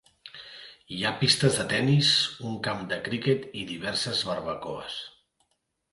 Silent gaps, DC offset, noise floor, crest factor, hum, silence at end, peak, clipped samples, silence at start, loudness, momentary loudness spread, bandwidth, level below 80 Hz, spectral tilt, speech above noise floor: none; under 0.1%; -76 dBFS; 22 dB; none; 0.85 s; -6 dBFS; under 0.1%; 0.25 s; -26 LUFS; 21 LU; 11.5 kHz; -60 dBFS; -4 dB/octave; 49 dB